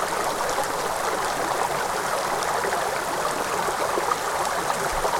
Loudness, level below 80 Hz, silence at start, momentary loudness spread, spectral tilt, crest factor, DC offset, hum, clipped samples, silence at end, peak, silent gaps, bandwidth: -25 LUFS; -46 dBFS; 0 s; 1 LU; -2 dB/octave; 16 dB; under 0.1%; none; under 0.1%; 0 s; -8 dBFS; none; 19 kHz